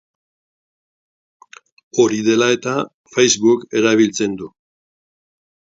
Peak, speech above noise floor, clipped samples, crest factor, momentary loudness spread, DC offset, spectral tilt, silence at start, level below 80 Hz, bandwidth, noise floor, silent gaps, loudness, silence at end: 0 dBFS; over 74 dB; under 0.1%; 18 dB; 10 LU; under 0.1%; -3.5 dB/octave; 1.95 s; -62 dBFS; 7.8 kHz; under -90 dBFS; 2.94-3.04 s; -16 LUFS; 1.25 s